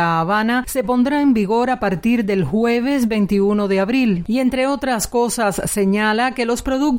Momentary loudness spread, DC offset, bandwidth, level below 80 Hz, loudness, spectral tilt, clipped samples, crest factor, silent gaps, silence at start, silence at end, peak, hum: 3 LU; under 0.1%; 16.5 kHz; -42 dBFS; -18 LUFS; -5 dB/octave; under 0.1%; 10 dB; none; 0 s; 0 s; -8 dBFS; none